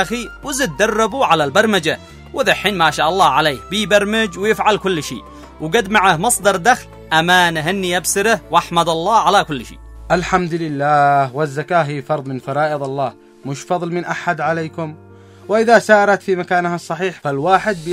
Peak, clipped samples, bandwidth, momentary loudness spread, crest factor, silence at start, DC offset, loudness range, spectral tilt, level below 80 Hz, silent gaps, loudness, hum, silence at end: 0 dBFS; under 0.1%; 16 kHz; 10 LU; 16 dB; 0 s; under 0.1%; 5 LU; -3.5 dB/octave; -44 dBFS; none; -16 LUFS; none; 0 s